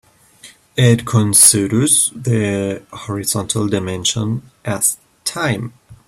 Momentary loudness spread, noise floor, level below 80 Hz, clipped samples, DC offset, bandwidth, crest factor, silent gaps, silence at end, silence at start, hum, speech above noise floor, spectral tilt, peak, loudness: 16 LU; -44 dBFS; -50 dBFS; under 0.1%; under 0.1%; 16 kHz; 18 dB; none; 0.15 s; 0.45 s; none; 28 dB; -3.5 dB/octave; 0 dBFS; -15 LUFS